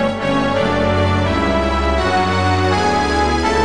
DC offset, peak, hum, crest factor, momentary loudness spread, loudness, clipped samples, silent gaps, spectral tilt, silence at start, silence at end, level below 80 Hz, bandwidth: 2%; -2 dBFS; none; 12 dB; 1 LU; -16 LUFS; under 0.1%; none; -5.5 dB/octave; 0 s; 0 s; -28 dBFS; 10.5 kHz